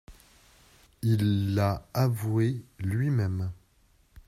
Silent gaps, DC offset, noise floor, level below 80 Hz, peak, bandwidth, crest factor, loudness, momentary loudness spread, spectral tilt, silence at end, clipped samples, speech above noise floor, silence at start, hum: none; under 0.1%; -64 dBFS; -56 dBFS; -12 dBFS; 15.5 kHz; 16 dB; -28 LUFS; 8 LU; -7.5 dB/octave; 0.75 s; under 0.1%; 37 dB; 0.1 s; none